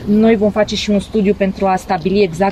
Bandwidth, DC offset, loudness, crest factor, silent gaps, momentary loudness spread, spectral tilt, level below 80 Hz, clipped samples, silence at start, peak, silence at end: 13 kHz; 0.4%; -15 LUFS; 12 dB; none; 4 LU; -6 dB/octave; -36 dBFS; under 0.1%; 0 s; -2 dBFS; 0 s